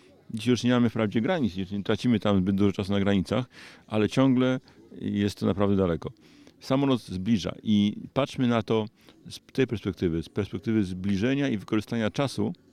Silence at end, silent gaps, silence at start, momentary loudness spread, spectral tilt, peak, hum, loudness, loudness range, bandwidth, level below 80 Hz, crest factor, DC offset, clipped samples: 0.2 s; none; 0.3 s; 9 LU; -7 dB/octave; -10 dBFS; none; -27 LUFS; 3 LU; 13.5 kHz; -56 dBFS; 18 dB; under 0.1%; under 0.1%